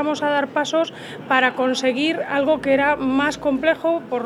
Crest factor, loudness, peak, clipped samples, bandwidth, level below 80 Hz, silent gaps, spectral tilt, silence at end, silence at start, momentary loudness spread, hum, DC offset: 18 dB; -20 LUFS; -2 dBFS; under 0.1%; 12 kHz; -54 dBFS; none; -4 dB/octave; 0 s; 0 s; 4 LU; none; under 0.1%